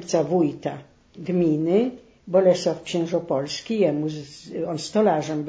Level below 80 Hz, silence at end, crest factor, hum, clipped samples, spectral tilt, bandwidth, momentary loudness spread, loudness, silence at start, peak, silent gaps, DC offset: -62 dBFS; 0 s; 18 dB; none; under 0.1%; -6 dB/octave; 8 kHz; 12 LU; -23 LUFS; 0 s; -6 dBFS; none; under 0.1%